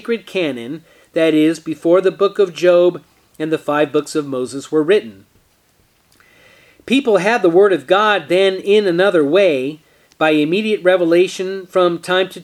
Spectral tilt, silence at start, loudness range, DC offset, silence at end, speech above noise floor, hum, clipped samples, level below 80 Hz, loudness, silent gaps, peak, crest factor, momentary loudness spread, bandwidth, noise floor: -5 dB/octave; 0.05 s; 6 LU; under 0.1%; 0 s; 42 dB; none; under 0.1%; -66 dBFS; -15 LUFS; none; 0 dBFS; 16 dB; 9 LU; 13 kHz; -57 dBFS